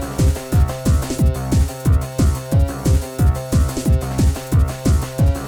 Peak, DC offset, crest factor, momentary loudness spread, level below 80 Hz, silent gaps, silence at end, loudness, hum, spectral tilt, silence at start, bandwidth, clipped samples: -6 dBFS; under 0.1%; 10 dB; 2 LU; -20 dBFS; none; 0 s; -18 LUFS; none; -6.5 dB/octave; 0 s; 18.5 kHz; under 0.1%